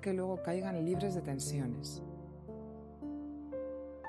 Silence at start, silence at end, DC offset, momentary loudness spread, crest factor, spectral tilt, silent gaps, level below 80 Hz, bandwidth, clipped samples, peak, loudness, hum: 0 s; 0 s; under 0.1%; 13 LU; 16 dB; -6 dB/octave; none; -60 dBFS; 13 kHz; under 0.1%; -24 dBFS; -39 LUFS; none